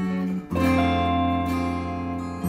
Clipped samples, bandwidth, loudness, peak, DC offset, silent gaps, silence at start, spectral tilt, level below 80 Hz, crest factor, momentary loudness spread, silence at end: under 0.1%; 16 kHz; -24 LUFS; -10 dBFS; under 0.1%; none; 0 s; -7 dB/octave; -42 dBFS; 14 dB; 8 LU; 0 s